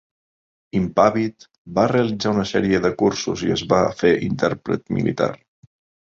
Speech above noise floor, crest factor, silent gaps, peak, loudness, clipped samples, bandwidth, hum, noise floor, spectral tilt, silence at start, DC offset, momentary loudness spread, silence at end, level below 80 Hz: over 71 dB; 18 dB; 1.58-1.65 s; -2 dBFS; -20 LUFS; under 0.1%; 7.8 kHz; none; under -90 dBFS; -6 dB/octave; 0.75 s; under 0.1%; 7 LU; 0.65 s; -48 dBFS